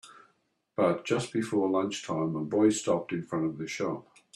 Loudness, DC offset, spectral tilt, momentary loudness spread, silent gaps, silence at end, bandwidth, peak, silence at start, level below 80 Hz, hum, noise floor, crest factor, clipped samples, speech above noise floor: -30 LUFS; under 0.1%; -5.5 dB/octave; 8 LU; none; 0.35 s; 12.5 kHz; -12 dBFS; 0.05 s; -70 dBFS; none; -72 dBFS; 18 dB; under 0.1%; 44 dB